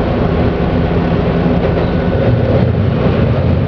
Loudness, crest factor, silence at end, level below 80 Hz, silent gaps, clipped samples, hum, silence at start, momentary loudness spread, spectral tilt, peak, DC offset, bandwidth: -13 LUFS; 12 dB; 0 s; -22 dBFS; none; under 0.1%; none; 0 s; 2 LU; -10 dB/octave; 0 dBFS; under 0.1%; 5.4 kHz